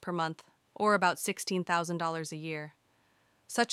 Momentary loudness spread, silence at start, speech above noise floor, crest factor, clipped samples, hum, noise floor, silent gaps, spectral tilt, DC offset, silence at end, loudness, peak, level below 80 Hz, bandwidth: 13 LU; 0 s; 38 dB; 20 dB; under 0.1%; none; -70 dBFS; none; -4 dB/octave; under 0.1%; 0 s; -32 LUFS; -12 dBFS; -80 dBFS; 16.5 kHz